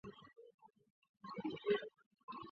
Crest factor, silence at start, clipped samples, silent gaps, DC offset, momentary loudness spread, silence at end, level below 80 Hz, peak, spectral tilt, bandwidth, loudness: 22 dB; 0.05 s; under 0.1%; 0.54-0.58 s, 0.90-1.02 s, 1.09-1.14 s, 2.06-2.11 s, 2.23-2.28 s; under 0.1%; 23 LU; 0 s; -82 dBFS; -24 dBFS; -3.5 dB/octave; 6.2 kHz; -43 LUFS